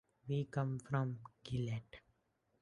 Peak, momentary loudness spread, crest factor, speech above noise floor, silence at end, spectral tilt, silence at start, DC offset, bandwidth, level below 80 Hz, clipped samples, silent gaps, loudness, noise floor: -22 dBFS; 13 LU; 20 dB; 41 dB; 0.65 s; -7.5 dB/octave; 0.25 s; under 0.1%; 10.5 kHz; -68 dBFS; under 0.1%; none; -41 LUFS; -80 dBFS